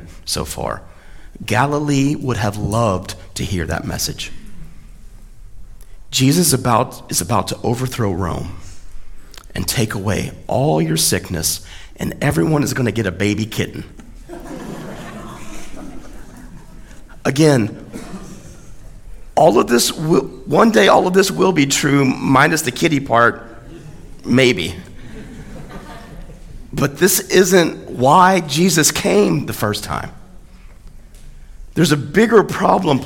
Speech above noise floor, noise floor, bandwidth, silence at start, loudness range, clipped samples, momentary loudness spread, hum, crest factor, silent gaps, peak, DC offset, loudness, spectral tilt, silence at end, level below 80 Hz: 22 dB; -38 dBFS; 17.5 kHz; 0 s; 9 LU; under 0.1%; 22 LU; none; 18 dB; none; 0 dBFS; under 0.1%; -16 LUFS; -4.5 dB/octave; 0 s; -38 dBFS